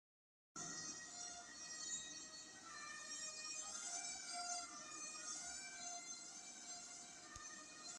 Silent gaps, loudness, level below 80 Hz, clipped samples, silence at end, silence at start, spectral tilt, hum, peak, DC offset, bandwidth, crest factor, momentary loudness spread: none; -49 LUFS; -82 dBFS; under 0.1%; 0 s; 0.55 s; 0.5 dB/octave; none; -34 dBFS; under 0.1%; 13 kHz; 18 dB; 7 LU